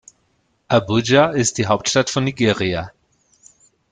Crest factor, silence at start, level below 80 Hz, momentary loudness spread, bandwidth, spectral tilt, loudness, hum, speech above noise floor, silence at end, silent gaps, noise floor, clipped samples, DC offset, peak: 18 dB; 0.7 s; -52 dBFS; 8 LU; 10 kHz; -4.5 dB/octave; -18 LUFS; none; 47 dB; 1 s; none; -64 dBFS; under 0.1%; under 0.1%; -2 dBFS